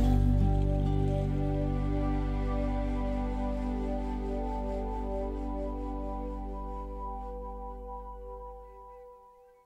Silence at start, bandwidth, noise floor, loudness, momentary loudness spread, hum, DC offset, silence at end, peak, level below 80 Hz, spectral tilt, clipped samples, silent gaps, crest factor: 0 s; 5.6 kHz; -57 dBFS; -33 LUFS; 15 LU; none; under 0.1%; 0.35 s; -16 dBFS; -34 dBFS; -9 dB/octave; under 0.1%; none; 16 dB